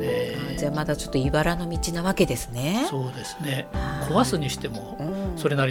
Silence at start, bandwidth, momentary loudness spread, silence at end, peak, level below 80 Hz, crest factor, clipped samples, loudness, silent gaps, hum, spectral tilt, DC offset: 0 s; 19 kHz; 8 LU; 0 s; -6 dBFS; -38 dBFS; 18 dB; under 0.1%; -26 LUFS; none; none; -5.5 dB/octave; under 0.1%